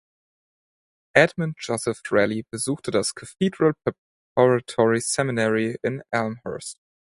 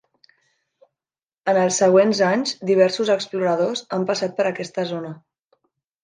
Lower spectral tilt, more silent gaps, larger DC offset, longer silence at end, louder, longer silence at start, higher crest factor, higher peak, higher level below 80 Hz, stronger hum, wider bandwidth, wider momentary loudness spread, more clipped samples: about the same, -4.5 dB/octave vs -4.5 dB/octave; first, 3.98-4.36 s vs none; neither; second, 0.35 s vs 0.9 s; second, -23 LUFS vs -20 LUFS; second, 1.15 s vs 1.45 s; first, 24 dB vs 18 dB; first, 0 dBFS vs -4 dBFS; first, -60 dBFS vs -72 dBFS; neither; first, 11.5 kHz vs 9.8 kHz; about the same, 10 LU vs 11 LU; neither